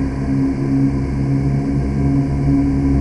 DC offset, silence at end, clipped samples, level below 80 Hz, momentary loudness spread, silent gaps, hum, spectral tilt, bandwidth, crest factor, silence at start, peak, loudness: under 0.1%; 0 s; under 0.1%; -26 dBFS; 3 LU; none; none; -9.5 dB/octave; 9.6 kHz; 12 dB; 0 s; -6 dBFS; -17 LUFS